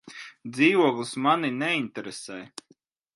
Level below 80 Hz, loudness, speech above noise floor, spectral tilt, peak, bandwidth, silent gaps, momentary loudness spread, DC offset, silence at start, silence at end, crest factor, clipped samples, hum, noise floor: -76 dBFS; -24 LUFS; 38 dB; -4.5 dB/octave; -6 dBFS; 11.5 kHz; none; 21 LU; under 0.1%; 0.05 s; 0.7 s; 20 dB; under 0.1%; none; -64 dBFS